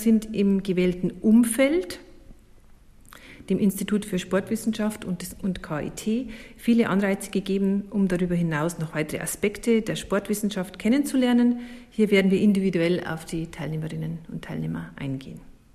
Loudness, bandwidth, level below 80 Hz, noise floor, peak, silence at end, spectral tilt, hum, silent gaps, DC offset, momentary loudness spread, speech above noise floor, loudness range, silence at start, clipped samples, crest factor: -25 LUFS; 15 kHz; -50 dBFS; -51 dBFS; -8 dBFS; 0.2 s; -6 dB/octave; none; none; under 0.1%; 12 LU; 27 dB; 5 LU; 0 s; under 0.1%; 16 dB